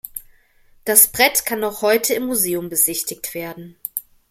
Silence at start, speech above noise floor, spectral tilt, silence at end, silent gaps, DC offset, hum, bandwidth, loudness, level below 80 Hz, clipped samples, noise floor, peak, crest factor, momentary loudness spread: 0.05 s; 34 dB; -1.5 dB/octave; 0.3 s; none; under 0.1%; none; 16.5 kHz; -17 LUFS; -56 dBFS; under 0.1%; -53 dBFS; 0 dBFS; 20 dB; 19 LU